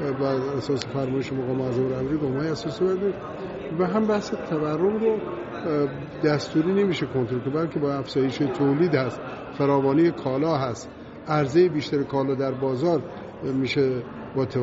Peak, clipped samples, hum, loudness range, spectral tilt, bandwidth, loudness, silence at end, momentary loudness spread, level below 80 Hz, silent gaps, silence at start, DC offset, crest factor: -6 dBFS; under 0.1%; none; 2 LU; -6.5 dB/octave; 7.6 kHz; -25 LUFS; 0 s; 9 LU; -56 dBFS; none; 0 s; under 0.1%; 18 dB